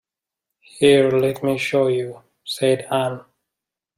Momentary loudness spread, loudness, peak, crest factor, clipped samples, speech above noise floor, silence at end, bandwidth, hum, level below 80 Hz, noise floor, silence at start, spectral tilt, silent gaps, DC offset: 16 LU; -19 LUFS; -2 dBFS; 18 dB; under 0.1%; 67 dB; 0.75 s; 15.5 kHz; none; -62 dBFS; -85 dBFS; 0.75 s; -5.5 dB/octave; none; under 0.1%